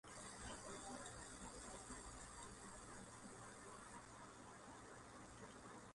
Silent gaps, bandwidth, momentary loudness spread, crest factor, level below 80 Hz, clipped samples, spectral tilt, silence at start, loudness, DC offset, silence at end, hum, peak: none; 11.5 kHz; 6 LU; 16 dB; -68 dBFS; under 0.1%; -3 dB/octave; 0.05 s; -56 LUFS; under 0.1%; 0 s; none; -40 dBFS